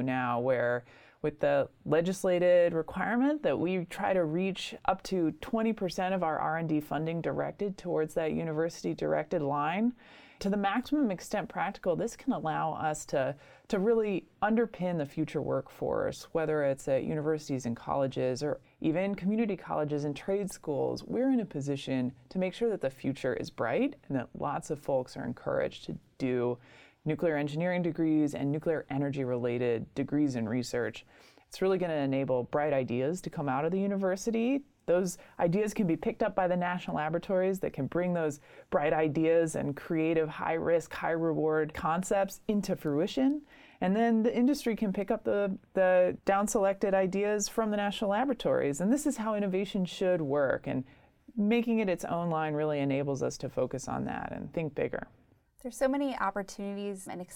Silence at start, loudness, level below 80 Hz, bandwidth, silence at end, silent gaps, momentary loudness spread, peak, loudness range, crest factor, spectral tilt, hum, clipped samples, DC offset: 0 s; -31 LUFS; -60 dBFS; 17.5 kHz; 0 s; none; 7 LU; -12 dBFS; 4 LU; 20 dB; -6 dB/octave; none; under 0.1%; under 0.1%